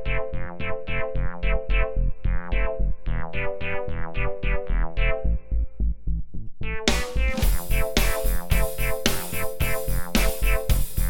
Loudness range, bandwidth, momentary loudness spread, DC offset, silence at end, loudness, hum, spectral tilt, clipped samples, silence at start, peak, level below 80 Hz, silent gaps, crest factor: 3 LU; 19 kHz; 8 LU; under 0.1%; 0 s; -27 LUFS; none; -4.5 dB/octave; under 0.1%; 0 s; -2 dBFS; -26 dBFS; none; 18 dB